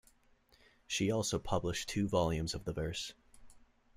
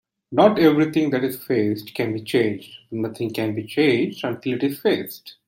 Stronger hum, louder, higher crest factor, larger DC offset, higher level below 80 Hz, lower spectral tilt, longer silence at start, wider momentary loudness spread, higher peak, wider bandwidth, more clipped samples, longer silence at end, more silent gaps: neither; second, -36 LUFS vs -21 LUFS; about the same, 18 dB vs 18 dB; neither; first, -54 dBFS vs -64 dBFS; second, -4.5 dB/octave vs -6.5 dB/octave; first, 0.9 s vs 0.3 s; second, 7 LU vs 10 LU; second, -18 dBFS vs -2 dBFS; about the same, 16 kHz vs 17 kHz; neither; first, 0.4 s vs 0.15 s; neither